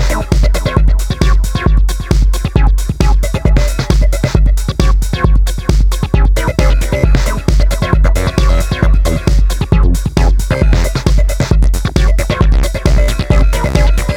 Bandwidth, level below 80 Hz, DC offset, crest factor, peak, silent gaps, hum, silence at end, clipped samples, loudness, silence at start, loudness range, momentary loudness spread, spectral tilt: 14.5 kHz; -10 dBFS; under 0.1%; 10 dB; 0 dBFS; none; none; 0 s; 0.3%; -13 LUFS; 0 s; 1 LU; 2 LU; -6 dB/octave